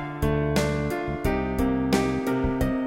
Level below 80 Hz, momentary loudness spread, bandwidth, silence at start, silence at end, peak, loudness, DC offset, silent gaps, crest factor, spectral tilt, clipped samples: -34 dBFS; 4 LU; 16.5 kHz; 0 s; 0 s; -8 dBFS; -25 LUFS; under 0.1%; none; 18 dB; -6.5 dB/octave; under 0.1%